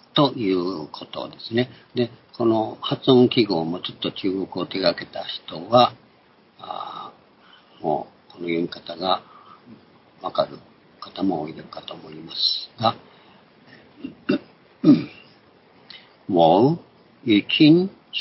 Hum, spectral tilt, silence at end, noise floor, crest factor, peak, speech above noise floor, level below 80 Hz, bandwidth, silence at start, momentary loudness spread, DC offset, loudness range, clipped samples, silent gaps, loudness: none; -10 dB/octave; 0 s; -56 dBFS; 22 dB; -2 dBFS; 34 dB; -64 dBFS; 5.8 kHz; 0.15 s; 20 LU; under 0.1%; 8 LU; under 0.1%; none; -22 LUFS